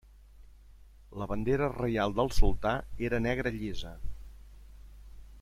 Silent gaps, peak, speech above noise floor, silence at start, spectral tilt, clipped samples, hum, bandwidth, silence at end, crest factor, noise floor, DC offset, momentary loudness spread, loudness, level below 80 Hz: none; -10 dBFS; 26 dB; 0.4 s; -6.5 dB/octave; under 0.1%; none; 13 kHz; 0 s; 20 dB; -54 dBFS; under 0.1%; 20 LU; -32 LUFS; -36 dBFS